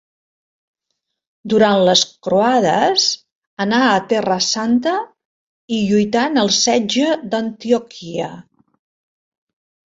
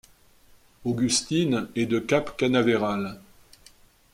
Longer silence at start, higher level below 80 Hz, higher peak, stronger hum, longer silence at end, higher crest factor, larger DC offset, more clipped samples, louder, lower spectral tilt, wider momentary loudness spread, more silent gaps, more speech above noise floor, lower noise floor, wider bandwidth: first, 1.45 s vs 0.8 s; about the same, -60 dBFS vs -56 dBFS; first, -2 dBFS vs -8 dBFS; neither; first, 1.5 s vs 0.95 s; about the same, 16 dB vs 18 dB; neither; neither; first, -16 LUFS vs -25 LUFS; about the same, -3.5 dB/octave vs -4.5 dB/octave; first, 12 LU vs 9 LU; first, 3.32-3.57 s, 5.25-5.68 s vs none; first, 60 dB vs 32 dB; first, -76 dBFS vs -56 dBFS; second, 8 kHz vs 15.5 kHz